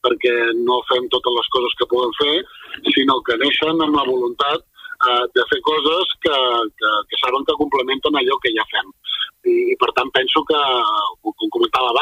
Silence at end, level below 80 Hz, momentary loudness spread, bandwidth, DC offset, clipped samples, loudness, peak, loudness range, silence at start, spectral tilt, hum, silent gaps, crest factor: 0 s; -56 dBFS; 6 LU; 15.5 kHz; under 0.1%; under 0.1%; -17 LUFS; -2 dBFS; 1 LU; 0.05 s; -4.5 dB/octave; none; none; 16 dB